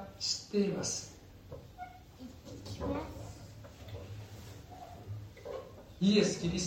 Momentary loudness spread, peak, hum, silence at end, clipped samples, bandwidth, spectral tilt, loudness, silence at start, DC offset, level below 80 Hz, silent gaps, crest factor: 22 LU; -16 dBFS; none; 0 s; under 0.1%; 16 kHz; -4.5 dB/octave; -35 LUFS; 0 s; under 0.1%; -56 dBFS; none; 22 dB